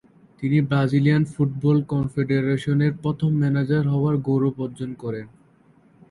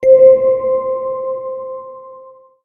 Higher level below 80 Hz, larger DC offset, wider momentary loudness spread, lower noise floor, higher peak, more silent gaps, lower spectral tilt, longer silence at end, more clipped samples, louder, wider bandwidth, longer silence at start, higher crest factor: about the same, -54 dBFS vs -56 dBFS; neither; second, 11 LU vs 23 LU; first, -56 dBFS vs -40 dBFS; second, -6 dBFS vs 0 dBFS; neither; about the same, -9 dB/octave vs -8.5 dB/octave; first, 0.85 s vs 0.4 s; neither; second, -22 LUFS vs -13 LUFS; first, 11 kHz vs 2.4 kHz; first, 0.4 s vs 0 s; about the same, 14 dB vs 14 dB